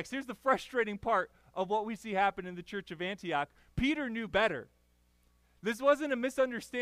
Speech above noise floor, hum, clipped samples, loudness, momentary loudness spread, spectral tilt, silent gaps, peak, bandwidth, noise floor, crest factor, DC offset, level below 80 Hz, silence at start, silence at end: 36 dB; 60 Hz at -65 dBFS; under 0.1%; -33 LUFS; 10 LU; -5 dB/octave; none; -14 dBFS; 15.5 kHz; -69 dBFS; 20 dB; under 0.1%; -58 dBFS; 0 s; 0 s